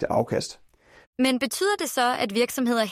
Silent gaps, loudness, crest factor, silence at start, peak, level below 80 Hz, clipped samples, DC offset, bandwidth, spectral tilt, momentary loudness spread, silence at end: 1.07-1.13 s; -24 LUFS; 16 dB; 0 s; -8 dBFS; -58 dBFS; under 0.1%; under 0.1%; 16 kHz; -3.5 dB/octave; 6 LU; 0 s